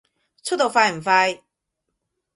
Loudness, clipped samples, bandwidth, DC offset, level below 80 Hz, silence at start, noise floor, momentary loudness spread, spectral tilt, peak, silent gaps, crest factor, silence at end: -19 LUFS; under 0.1%; 11.5 kHz; under 0.1%; -70 dBFS; 0.45 s; -79 dBFS; 15 LU; -2.5 dB/octave; -2 dBFS; none; 20 dB; 1 s